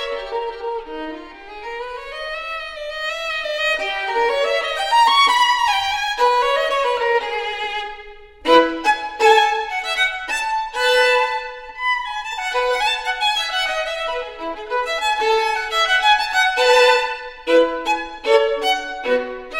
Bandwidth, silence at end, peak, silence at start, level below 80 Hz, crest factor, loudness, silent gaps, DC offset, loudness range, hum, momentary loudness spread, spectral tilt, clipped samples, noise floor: 16.5 kHz; 0 s; 0 dBFS; 0 s; -48 dBFS; 18 dB; -18 LUFS; none; under 0.1%; 6 LU; none; 14 LU; -0.5 dB/octave; under 0.1%; -39 dBFS